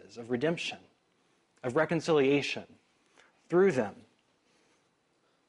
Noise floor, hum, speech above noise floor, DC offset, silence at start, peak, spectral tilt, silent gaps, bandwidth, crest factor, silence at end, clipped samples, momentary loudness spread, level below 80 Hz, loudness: -72 dBFS; none; 43 dB; under 0.1%; 0.15 s; -14 dBFS; -5.5 dB/octave; none; 11 kHz; 18 dB; 1.55 s; under 0.1%; 13 LU; -74 dBFS; -30 LUFS